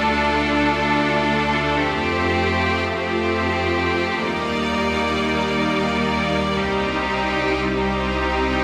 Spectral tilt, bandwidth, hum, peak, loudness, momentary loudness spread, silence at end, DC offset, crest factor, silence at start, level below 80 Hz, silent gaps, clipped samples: -5.5 dB/octave; 13.5 kHz; none; -8 dBFS; -20 LUFS; 3 LU; 0 s; under 0.1%; 12 dB; 0 s; -36 dBFS; none; under 0.1%